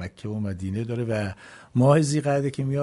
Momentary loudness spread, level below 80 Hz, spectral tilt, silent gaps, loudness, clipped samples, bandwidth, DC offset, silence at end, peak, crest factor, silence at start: 13 LU; -56 dBFS; -7 dB/octave; none; -25 LUFS; under 0.1%; 11.5 kHz; under 0.1%; 0 s; -6 dBFS; 18 dB; 0 s